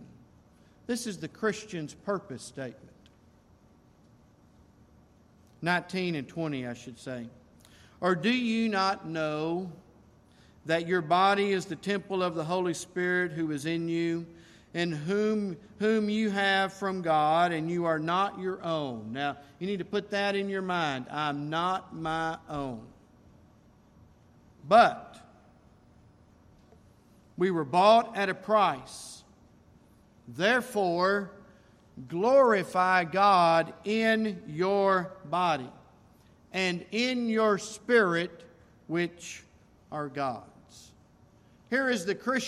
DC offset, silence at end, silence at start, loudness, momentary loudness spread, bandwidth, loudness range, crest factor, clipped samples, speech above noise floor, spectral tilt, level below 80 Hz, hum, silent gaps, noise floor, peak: under 0.1%; 0 s; 0 s; -28 LUFS; 16 LU; 14 kHz; 11 LU; 22 dB; under 0.1%; 32 dB; -5 dB/octave; -66 dBFS; none; none; -60 dBFS; -8 dBFS